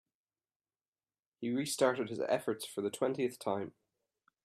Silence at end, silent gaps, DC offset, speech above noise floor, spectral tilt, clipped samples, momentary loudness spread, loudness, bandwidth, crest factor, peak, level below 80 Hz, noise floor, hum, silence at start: 0.75 s; none; under 0.1%; over 55 dB; -4.5 dB/octave; under 0.1%; 8 LU; -35 LUFS; 15.5 kHz; 22 dB; -16 dBFS; -84 dBFS; under -90 dBFS; none; 1.4 s